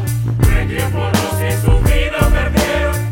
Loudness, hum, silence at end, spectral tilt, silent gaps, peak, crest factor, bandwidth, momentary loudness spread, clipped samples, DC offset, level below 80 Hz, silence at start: -16 LUFS; none; 0 s; -5.5 dB/octave; none; 0 dBFS; 14 dB; 18 kHz; 3 LU; under 0.1%; under 0.1%; -18 dBFS; 0 s